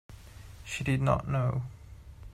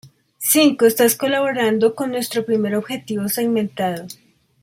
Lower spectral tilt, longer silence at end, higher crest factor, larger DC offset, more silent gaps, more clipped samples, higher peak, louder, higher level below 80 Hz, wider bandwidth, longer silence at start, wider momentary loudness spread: first, -6.5 dB/octave vs -3.5 dB/octave; second, 0 s vs 0.5 s; about the same, 20 dB vs 16 dB; neither; neither; neither; second, -14 dBFS vs -4 dBFS; second, -30 LUFS vs -18 LUFS; first, -48 dBFS vs -64 dBFS; second, 12.5 kHz vs 16.5 kHz; about the same, 0.1 s vs 0.05 s; first, 23 LU vs 10 LU